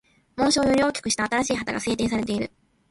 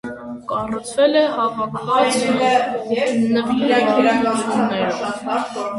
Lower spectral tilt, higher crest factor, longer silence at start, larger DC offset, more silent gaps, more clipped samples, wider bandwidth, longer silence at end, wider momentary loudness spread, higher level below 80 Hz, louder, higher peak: about the same, -3.5 dB/octave vs -4.5 dB/octave; about the same, 16 dB vs 16 dB; first, 0.35 s vs 0.05 s; neither; neither; neither; about the same, 11.5 kHz vs 11.5 kHz; first, 0.45 s vs 0 s; about the same, 9 LU vs 8 LU; first, -50 dBFS vs -56 dBFS; second, -23 LUFS vs -18 LUFS; second, -8 dBFS vs -2 dBFS